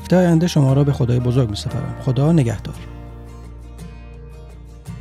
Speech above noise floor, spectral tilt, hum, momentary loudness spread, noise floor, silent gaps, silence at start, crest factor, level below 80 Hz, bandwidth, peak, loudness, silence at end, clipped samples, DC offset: 21 dB; -7.5 dB/octave; none; 23 LU; -37 dBFS; none; 0 s; 16 dB; -36 dBFS; 13.5 kHz; -4 dBFS; -17 LUFS; 0 s; under 0.1%; under 0.1%